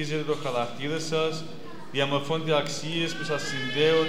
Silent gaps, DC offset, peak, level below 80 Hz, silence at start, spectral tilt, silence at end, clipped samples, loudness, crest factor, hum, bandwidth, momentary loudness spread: none; 2%; -10 dBFS; -68 dBFS; 0 s; -4.5 dB/octave; 0 s; under 0.1%; -28 LUFS; 18 dB; none; 15 kHz; 7 LU